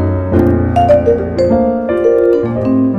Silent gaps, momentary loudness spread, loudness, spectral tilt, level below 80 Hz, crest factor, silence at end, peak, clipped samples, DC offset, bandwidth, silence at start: none; 4 LU; -12 LUFS; -9.5 dB/octave; -30 dBFS; 10 dB; 0 s; 0 dBFS; under 0.1%; under 0.1%; 8 kHz; 0 s